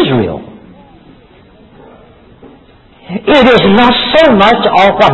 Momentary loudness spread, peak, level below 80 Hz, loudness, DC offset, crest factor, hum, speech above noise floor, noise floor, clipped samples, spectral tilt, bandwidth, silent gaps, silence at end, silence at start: 13 LU; 0 dBFS; -38 dBFS; -7 LUFS; under 0.1%; 10 dB; none; 34 dB; -41 dBFS; 0.6%; -6.5 dB/octave; 8 kHz; none; 0 s; 0 s